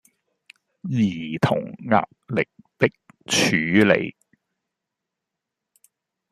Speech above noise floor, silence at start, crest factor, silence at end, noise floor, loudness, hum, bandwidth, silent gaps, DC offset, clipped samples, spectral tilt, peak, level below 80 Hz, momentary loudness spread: 63 dB; 0.85 s; 22 dB; 2.2 s; -84 dBFS; -22 LUFS; none; 14 kHz; none; under 0.1%; under 0.1%; -4.5 dB/octave; -2 dBFS; -60 dBFS; 10 LU